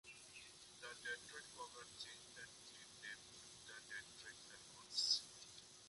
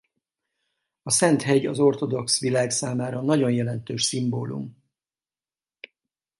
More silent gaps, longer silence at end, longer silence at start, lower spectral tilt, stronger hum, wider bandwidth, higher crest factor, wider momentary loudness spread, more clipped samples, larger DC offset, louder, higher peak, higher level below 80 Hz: neither; second, 0 s vs 1.7 s; second, 0.05 s vs 1.05 s; second, 0.5 dB/octave vs -4.5 dB/octave; neither; about the same, 11.5 kHz vs 12 kHz; first, 26 dB vs 20 dB; first, 17 LU vs 11 LU; neither; neither; second, -49 LUFS vs -23 LUFS; second, -26 dBFS vs -4 dBFS; second, -82 dBFS vs -66 dBFS